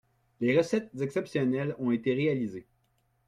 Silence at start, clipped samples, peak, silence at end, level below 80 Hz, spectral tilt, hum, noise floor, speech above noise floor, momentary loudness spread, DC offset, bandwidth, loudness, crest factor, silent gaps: 0.4 s; under 0.1%; -12 dBFS; 0.65 s; -68 dBFS; -7 dB/octave; none; -72 dBFS; 44 dB; 7 LU; under 0.1%; 11.5 kHz; -29 LUFS; 18 dB; none